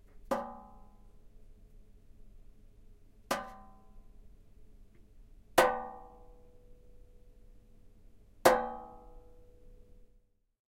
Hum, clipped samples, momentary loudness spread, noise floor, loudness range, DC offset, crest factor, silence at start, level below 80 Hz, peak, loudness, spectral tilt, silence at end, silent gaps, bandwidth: none; under 0.1%; 28 LU; -67 dBFS; 10 LU; under 0.1%; 30 dB; 0.25 s; -56 dBFS; -8 dBFS; -32 LUFS; -3 dB/octave; 1.6 s; none; 16 kHz